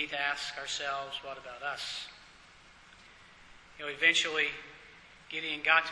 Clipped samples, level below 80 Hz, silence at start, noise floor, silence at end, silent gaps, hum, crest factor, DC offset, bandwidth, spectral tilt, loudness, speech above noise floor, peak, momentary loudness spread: under 0.1%; -68 dBFS; 0 s; -57 dBFS; 0 s; none; none; 26 dB; under 0.1%; 11 kHz; -0.5 dB/octave; -31 LUFS; 24 dB; -10 dBFS; 20 LU